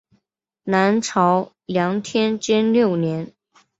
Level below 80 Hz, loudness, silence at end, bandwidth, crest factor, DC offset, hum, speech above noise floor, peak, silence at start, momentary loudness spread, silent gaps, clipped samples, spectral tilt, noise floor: -62 dBFS; -20 LUFS; 0.5 s; 8 kHz; 18 dB; under 0.1%; none; 54 dB; -2 dBFS; 0.65 s; 8 LU; none; under 0.1%; -5.5 dB/octave; -73 dBFS